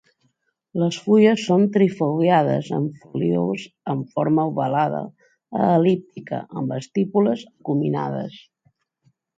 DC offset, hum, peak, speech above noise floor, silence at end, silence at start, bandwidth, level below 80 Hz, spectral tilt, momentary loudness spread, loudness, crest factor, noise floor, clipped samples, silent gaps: under 0.1%; none; -4 dBFS; 48 dB; 1 s; 0.75 s; 7.8 kHz; -68 dBFS; -7.5 dB/octave; 13 LU; -21 LUFS; 18 dB; -69 dBFS; under 0.1%; none